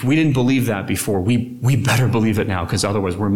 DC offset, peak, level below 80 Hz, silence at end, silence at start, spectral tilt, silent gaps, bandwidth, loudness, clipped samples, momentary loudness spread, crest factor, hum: 0.7%; -4 dBFS; -44 dBFS; 0 s; 0 s; -6 dB/octave; none; 18 kHz; -18 LUFS; under 0.1%; 4 LU; 12 dB; none